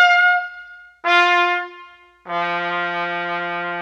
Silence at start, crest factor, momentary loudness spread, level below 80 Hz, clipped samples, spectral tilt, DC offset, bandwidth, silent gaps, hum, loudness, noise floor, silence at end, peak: 0 s; 18 dB; 14 LU; -66 dBFS; under 0.1%; -3.5 dB/octave; under 0.1%; 8.4 kHz; none; none; -18 LUFS; -44 dBFS; 0 s; -2 dBFS